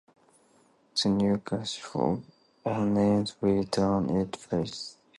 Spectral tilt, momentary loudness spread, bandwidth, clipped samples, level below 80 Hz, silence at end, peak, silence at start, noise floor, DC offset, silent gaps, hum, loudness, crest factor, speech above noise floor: -6 dB/octave; 8 LU; 11.5 kHz; under 0.1%; -56 dBFS; 0.25 s; -12 dBFS; 0.95 s; -63 dBFS; under 0.1%; none; none; -28 LUFS; 16 dB; 36 dB